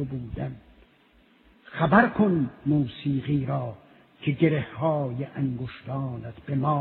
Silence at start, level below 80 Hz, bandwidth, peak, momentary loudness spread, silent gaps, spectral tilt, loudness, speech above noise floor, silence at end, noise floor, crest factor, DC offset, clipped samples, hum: 0 s; -54 dBFS; 4.4 kHz; -4 dBFS; 14 LU; none; -11 dB/octave; -26 LUFS; 34 dB; 0 s; -60 dBFS; 22 dB; under 0.1%; under 0.1%; none